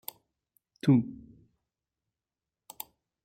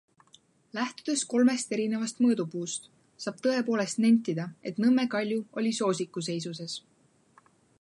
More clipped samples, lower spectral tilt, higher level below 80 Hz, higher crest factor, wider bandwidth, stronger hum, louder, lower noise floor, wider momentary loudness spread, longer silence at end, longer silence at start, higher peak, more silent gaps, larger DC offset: neither; first, -7.5 dB/octave vs -4.5 dB/octave; first, -68 dBFS vs -80 dBFS; first, 22 dB vs 16 dB; first, 16.5 kHz vs 11.5 kHz; neither; about the same, -28 LUFS vs -29 LUFS; first, under -90 dBFS vs -64 dBFS; first, 19 LU vs 13 LU; first, 2.1 s vs 1 s; about the same, 0.85 s vs 0.75 s; about the same, -12 dBFS vs -14 dBFS; neither; neither